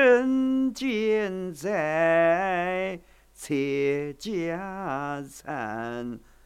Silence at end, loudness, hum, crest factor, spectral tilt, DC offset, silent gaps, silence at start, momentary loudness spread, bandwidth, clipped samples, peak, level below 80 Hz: 0.3 s; -27 LUFS; none; 18 dB; -5.5 dB/octave; under 0.1%; none; 0 s; 12 LU; 15 kHz; under 0.1%; -8 dBFS; -58 dBFS